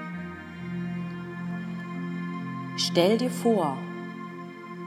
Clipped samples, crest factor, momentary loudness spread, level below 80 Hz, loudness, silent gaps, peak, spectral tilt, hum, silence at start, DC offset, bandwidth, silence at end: under 0.1%; 22 dB; 15 LU; -70 dBFS; -29 LUFS; none; -8 dBFS; -5.5 dB/octave; none; 0 s; under 0.1%; 16 kHz; 0 s